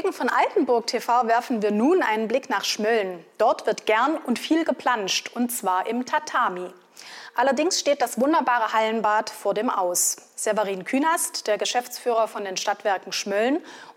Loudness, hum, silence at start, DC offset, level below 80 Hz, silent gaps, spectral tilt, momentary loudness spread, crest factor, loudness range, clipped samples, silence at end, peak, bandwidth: -23 LUFS; none; 0 s; under 0.1%; -84 dBFS; none; -2.5 dB/octave; 5 LU; 14 dB; 2 LU; under 0.1%; 0.05 s; -10 dBFS; 16.5 kHz